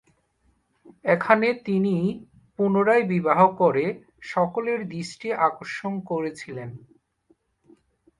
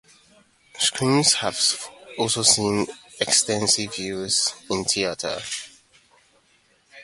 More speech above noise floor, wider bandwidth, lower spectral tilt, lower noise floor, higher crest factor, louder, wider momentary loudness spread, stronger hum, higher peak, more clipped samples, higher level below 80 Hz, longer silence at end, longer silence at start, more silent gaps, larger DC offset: first, 44 dB vs 39 dB; about the same, 11 kHz vs 12 kHz; first, -7 dB/octave vs -2 dB/octave; first, -67 dBFS vs -61 dBFS; about the same, 20 dB vs 22 dB; about the same, -23 LUFS vs -21 LUFS; first, 17 LU vs 13 LU; neither; about the same, -4 dBFS vs -4 dBFS; neither; second, -64 dBFS vs -58 dBFS; first, 1.4 s vs 0 s; first, 1.05 s vs 0.75 s; neither; neither